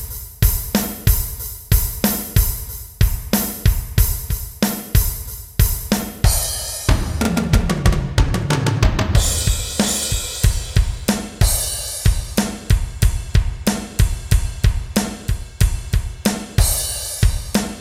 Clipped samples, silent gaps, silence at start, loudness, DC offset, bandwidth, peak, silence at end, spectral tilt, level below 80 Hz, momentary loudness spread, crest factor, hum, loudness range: under 0.1%; none; 0 s; -19 LUFS; under 0.1%; 16.5 kHz; 0 dBFS; 0 s; -4.5 dB/octave; -22 dBFS; 5 LU; 18 dB; none; 2 LU